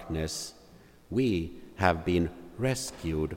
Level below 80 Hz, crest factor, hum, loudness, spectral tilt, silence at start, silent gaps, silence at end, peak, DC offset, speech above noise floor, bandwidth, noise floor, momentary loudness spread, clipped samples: -50 dBFS; 22 dB; none; -31 LUFS; -5.5 dB/octave; 0 s; none; 0 s; -8 dBFS; under 0.1%; 26 dB; 16.5 kHz; -55 dBFS; 8 LU; under 0.1%